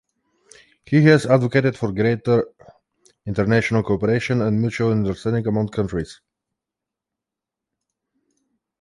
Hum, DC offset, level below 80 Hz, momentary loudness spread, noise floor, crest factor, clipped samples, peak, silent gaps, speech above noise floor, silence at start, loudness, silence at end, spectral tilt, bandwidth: none; under 0.1%; -48 dBFS; 11 LU; -86 dBFS; 20 dB; under 0.1%; -2 dBFS; none; 67 dB; 0.9 s; -20 LUFS; 2.7 s; -7.5 dB/octave; 11.5 kHz